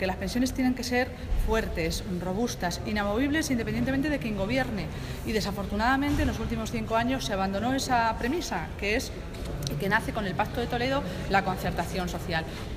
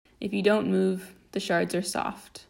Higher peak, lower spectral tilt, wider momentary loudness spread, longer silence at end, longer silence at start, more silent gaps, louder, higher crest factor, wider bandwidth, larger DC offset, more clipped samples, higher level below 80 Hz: about the same, -10 dBFS vs -10 dBFS; about the same, -5 dB/octave vs -5 dB/octave; second, 6 LU vs 11 LU; about the same, 0 s vs 0.1 s; second, 0 s vs 0.2 s; neither; about the same, -29 LUFS vs -27 LUFS; about the same, 18 dB vs 18 dB; about the same, 16 kHz vs 16 kHz; neither; neither; first, -38 dBFS vs -62 dBFS